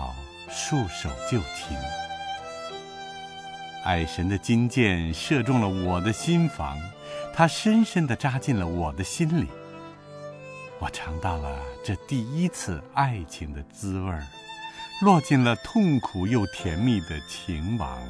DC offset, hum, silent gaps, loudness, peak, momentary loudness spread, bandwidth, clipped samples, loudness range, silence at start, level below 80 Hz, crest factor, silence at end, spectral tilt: under 0.1%; none; none; -26 LUFS; -6 dBFS; 16 LU; 11 kHz; under 0.1%; 7 LU; 0 s; -44 dBFS; 20 dB; 0 s; -5.5 dB/octave